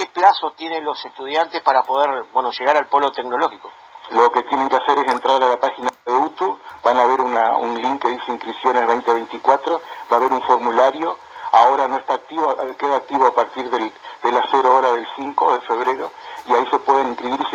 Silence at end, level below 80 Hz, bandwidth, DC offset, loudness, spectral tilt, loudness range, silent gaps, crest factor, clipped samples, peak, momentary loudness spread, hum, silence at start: 0 s; -66 dBFS; 9.8 kHz; under 0.1%; -18 LUFS; -3 dB/octave; 2 LU; none; 18 dB; under 0.1%; 0 dBFS; 9 LU; none; 0 s